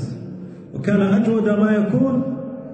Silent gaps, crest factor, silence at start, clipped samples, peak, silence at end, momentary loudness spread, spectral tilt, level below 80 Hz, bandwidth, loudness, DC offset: none; 12 dB; 0 s; under 0.1%; -6 dBFS; 0 s; 16 LU; -9 dB/octave; -56 dBFS; 8.4 kHz; -19 LUFS; under 0.1%